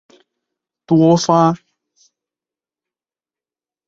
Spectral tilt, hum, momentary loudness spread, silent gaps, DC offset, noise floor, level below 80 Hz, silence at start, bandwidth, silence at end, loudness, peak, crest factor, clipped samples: -6.5 dB/octave; none; 6 LU; none; under 0.1%; under -90 dBFS; -62 dBFS; 0.9 s; 7.8 kHz; 2.3 s; -14 LUFS; -2 dBFS; 18 dB; under 0.1%